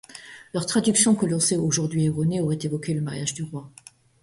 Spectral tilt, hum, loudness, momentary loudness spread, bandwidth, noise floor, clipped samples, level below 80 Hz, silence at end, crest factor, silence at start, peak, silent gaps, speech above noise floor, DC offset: -4.5 dB/octave; none; -23 LUFS; 15 LU; 11.5 kHz; -44 dBFS; under 0.1%; -58 dBFS; 0.55 s; 18 dB; 0.1 s; -6 dBFS; none; 21 dB; under 0.1%